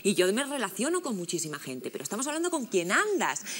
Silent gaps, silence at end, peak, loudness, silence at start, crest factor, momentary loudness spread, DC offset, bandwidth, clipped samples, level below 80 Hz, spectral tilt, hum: none; 0 s; -10 dBFS; -29 LUFS; 0 s; 18 dB; 9 LU; under 0.1%; 16.5 kHz; under 0.1%; -86 dBFS; -3 dB/octave; none